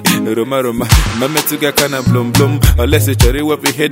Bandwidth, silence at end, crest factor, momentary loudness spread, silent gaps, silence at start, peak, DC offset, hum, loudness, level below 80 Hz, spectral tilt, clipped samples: 16.5 kHz; 0 s; 12 dB; 4 LU; none; 0 s; 0 dBFS; under 0.1%; none; -13 LUFS; -20 dBFS; -4.5 dB/octave; 0.3%